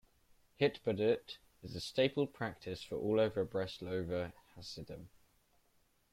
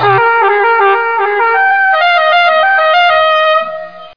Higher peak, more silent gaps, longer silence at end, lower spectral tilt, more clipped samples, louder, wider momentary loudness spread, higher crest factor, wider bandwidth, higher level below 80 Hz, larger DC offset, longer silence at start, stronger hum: second, -18 dBFS vs 0 dBFS; neither; first, 1.05 s vs 0.05 s; about the same, -6 dB/octave vs -5 dB/octave; neither; second, -37 LUFS vs -9 LUFS; first, 16 LU vs 4 LU; first, 20 dB vs 10 dB; first, 15.5 kHz vs 5.2 kHz; second, -66 dBFS vs -56 dBFS; second, under 0.1% vs 0.9%; first, 0.6 s vs 0 s; neither